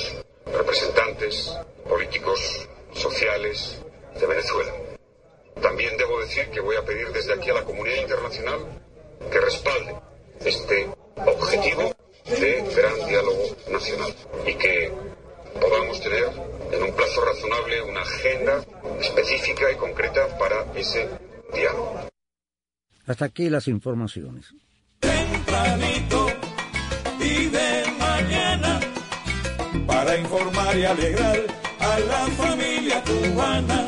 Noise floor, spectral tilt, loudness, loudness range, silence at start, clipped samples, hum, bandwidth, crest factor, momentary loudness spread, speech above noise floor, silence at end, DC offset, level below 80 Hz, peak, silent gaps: under -90 dBFS; -4 dB/octave; -23 LUFS; 4 LU; 0 s; under 0.1%; none; 10.5 kHz; 18 dB; 11 LU; over 67 dB; 0 s; under 0.1%; -38 dBFS; -6 dBFS; none